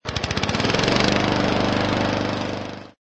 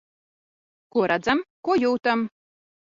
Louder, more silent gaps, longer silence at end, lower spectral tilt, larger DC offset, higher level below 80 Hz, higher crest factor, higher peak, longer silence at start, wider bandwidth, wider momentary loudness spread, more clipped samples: first, -21 LUFS vs -24 LUFS; second, none vs 1.50-1.63 s; second, 0.25 s vs 0.6 s; about the same, -5 dB/octave vs -5.5 dB/octave; neither; first, -40 dBFS vs -64 dBFS; about the same, 20 dB vs 20 dB; first, -2 dBFS vs -6 dBFS; second, 0.05 s vs 0.95 s; first, 9 kHz vs 7.6 kHz; first, 11 LU vs 6 LU; neither